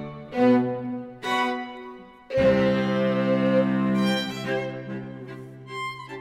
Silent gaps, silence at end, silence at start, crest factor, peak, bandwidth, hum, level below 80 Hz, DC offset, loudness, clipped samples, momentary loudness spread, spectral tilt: none; 0 s; 0 s; 16 dB; -8 dBFS; 14.5 kHz; none; -54 dBFS; under 0.1%; -24 LUFS; under 0.1%; 17 LU; -6.5 dB/octave